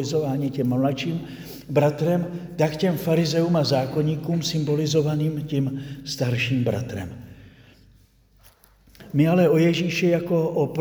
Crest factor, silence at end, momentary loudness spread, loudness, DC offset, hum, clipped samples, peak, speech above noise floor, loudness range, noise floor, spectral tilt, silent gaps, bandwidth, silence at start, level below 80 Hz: 16 dB; 0 s; 12 LU; -23 LUFS; under 0.1%; none; under 0.1%; -6 dBFS; 34 dB; 6 LU; -56 dBFS; -6.5 dB/octave; none; over 20 kHz; 0 s; -54 dBFS